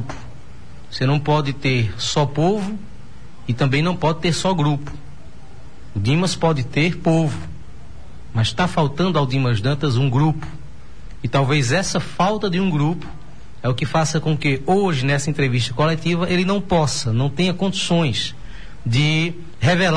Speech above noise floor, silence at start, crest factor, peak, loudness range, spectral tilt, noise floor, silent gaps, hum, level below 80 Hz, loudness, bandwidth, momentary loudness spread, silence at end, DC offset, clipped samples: 23 dB; 0 s; 14 dB; -6 dBFS; 2 LU; -5.5 dB/octave; -41 dBFS; none; none; -42 dBFS; -20 LUFS; 10.5 kHz; 13 LU; 0 s; 3%; under 0.1%